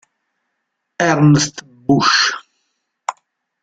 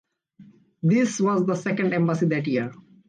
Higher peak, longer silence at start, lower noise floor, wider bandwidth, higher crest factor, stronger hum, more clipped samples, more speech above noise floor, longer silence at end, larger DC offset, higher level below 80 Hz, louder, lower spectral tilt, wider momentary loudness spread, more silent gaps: first, -2 dBFS vs -12 dBFS; first, 1 s vs 0.4 s; first, -74 dBFS vs -52 dBFS; about the same, 9 kHz vs 9.6 kHz; about the same, 16 dB vs 12 dB; neither; neither; first, 61 dB vs 30 dB; first, 0.5 s vs 0.35 s; neither; first, -52 dBFS vs -68 dBFS; first, -14 LUFS vs -23 LUFS; second, -4.5 dB/octave vs -6.5 dB/octave; first, 17 LU vs 6 LU; neither